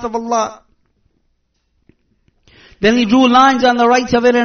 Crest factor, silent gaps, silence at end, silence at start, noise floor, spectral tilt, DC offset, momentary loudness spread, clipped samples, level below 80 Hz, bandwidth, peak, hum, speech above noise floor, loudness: 14 dB; none; 0 s; 0 s; -64 dBFS; -2.5 dB/octave; under 0.1%; 9 LU; under 0.1%; -46 dBFS; 6.6 kHz; 0 dBFS; none; 52 dB; -12 LUFS